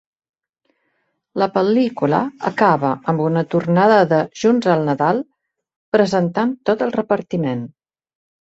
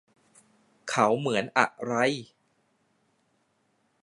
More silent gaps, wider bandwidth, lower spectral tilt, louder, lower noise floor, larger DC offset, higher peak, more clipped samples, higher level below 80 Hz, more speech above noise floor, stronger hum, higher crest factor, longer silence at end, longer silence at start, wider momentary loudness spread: first, 5.76-5.92 s vs none; second, 8 kHz vs 11.5 kHz; first, -7 dB/octave vs -4.5 dB/octave; first, -18 LUFS vs -26 LUFS; about the same, -69 dBFS vs -71 dBFS; neither; about the same, -2 dBFS vs -4 dBFS; neither; first, -60 dBFS vs -76 dBFS; first, 53 dB vs 46 dB; neither; second, 16 dB vs 26 dB; second, 0.8 s vs 1.8 s; first, 1.35 s vs 0.85 s; about the same, 8 LU vs 10 LU